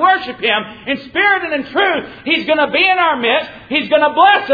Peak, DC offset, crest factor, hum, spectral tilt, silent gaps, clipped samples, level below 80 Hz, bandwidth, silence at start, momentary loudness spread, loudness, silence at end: 0 dBFS; under 0.1%; 14 dB; none; -5.5 dB/octave; none; under 0.1%; -54 dBFS; 5 kHz; 0 s; 8 LU; -14 LUFS; 0 s